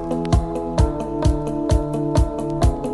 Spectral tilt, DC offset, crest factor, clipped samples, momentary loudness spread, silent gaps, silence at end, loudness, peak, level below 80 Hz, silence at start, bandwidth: -7.5 dB/octave; under 0.1%; 16 dB; under 0.1%; 2 LU; none; 0 s; -21 LUFS; -4 dBFS; -24 dBFS; 0 s; 11.5 kHz